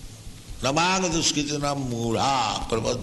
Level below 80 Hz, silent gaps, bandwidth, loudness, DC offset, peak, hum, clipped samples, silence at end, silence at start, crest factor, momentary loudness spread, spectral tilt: -42 dBFS; none; 12 kHz; -24 LUFS; under 0.1%; -8 dBFS; none; under 0.1%; 0 s; 0 s; 18 dB; 13 LU; -3.5 dB/octave